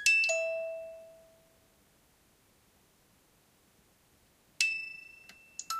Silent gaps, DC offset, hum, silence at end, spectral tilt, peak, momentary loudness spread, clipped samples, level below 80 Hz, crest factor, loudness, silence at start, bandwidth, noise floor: none; under 0.1%; none; 0 s; 2 dB/octave; -10 dBFS; 26 LU; under 0.1%; -76 dBFS; 28 dB; -31 LUFS; 0 s; 15.5 kHz; -67 dBFS